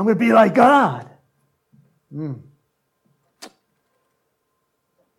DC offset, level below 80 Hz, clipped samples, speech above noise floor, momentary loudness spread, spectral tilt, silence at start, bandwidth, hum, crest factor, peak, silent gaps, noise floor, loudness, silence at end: under 0.1%; -70 dBFS; under 0.1%; 56 dB; 23 LU; -7 dB/octave; 0 s; 13.5 kHz; none; 20 dB; -2 dBFS; none; -72 dBFS; -15 LUFS; 1.75 s